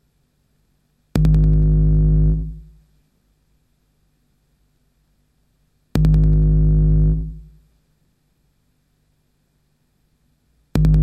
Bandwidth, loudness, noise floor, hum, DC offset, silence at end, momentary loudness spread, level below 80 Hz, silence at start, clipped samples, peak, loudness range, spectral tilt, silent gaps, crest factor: 5.4 kHz; -17 LUFS; -64 dBFS; 50 Hz at -45 dBFS; under 0.1%; 0 s; 11 LU; -22 dBFS; 1.15 s; under 0.1%; -2 dBFS; 9 LU; -9.5 dB/octave; none; 16 dB